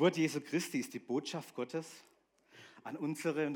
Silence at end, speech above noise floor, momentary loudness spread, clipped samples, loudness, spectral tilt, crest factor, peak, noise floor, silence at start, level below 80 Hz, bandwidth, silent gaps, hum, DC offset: 0 s; 27 dB; 18 LU; under 0.1%; -38 LUFS; -5 dB/octave; 22 dB; -16 dBFS; -63 dBFS; 0 s; under -90 dBFS; 18 kHz; none; none; under 0.1%